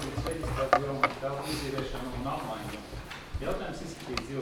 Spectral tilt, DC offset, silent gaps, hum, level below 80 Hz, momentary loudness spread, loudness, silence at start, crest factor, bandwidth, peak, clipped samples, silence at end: -5 dB/octave; under 0.1%; none; none; -44 dBFS; 13 LU; -33 LUFS; 0 s; 28 dB; 19.5 kHz; -6 dBFS; under 0.1%; 0 s